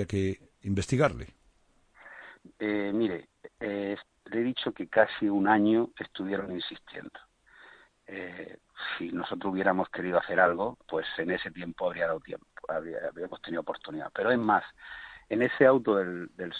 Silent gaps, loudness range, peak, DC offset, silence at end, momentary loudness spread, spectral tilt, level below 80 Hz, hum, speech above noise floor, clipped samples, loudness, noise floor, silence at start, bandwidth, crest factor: none; 7 LU; -8 dBFS; under 0.1%; 0 s; 19 LU; -6.5 dB/octave; -60 dBFS; none; 36 dB; under 0.1%; -29 LUFS; -65 dBFS; 0 s; 10 kHz; 22 dB